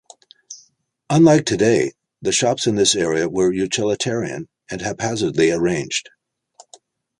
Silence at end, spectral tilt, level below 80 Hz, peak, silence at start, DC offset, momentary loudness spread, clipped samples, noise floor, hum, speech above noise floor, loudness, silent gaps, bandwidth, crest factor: 1.2 s; -4 dB/octave; -52 dBFS; -2 dBFS; 0.5 s; under 0.1%; 16 LU; under 0.1%; -59 dBFS; none; 41 dB; -18 LUFS; none; 11.5 kHz; 18 dB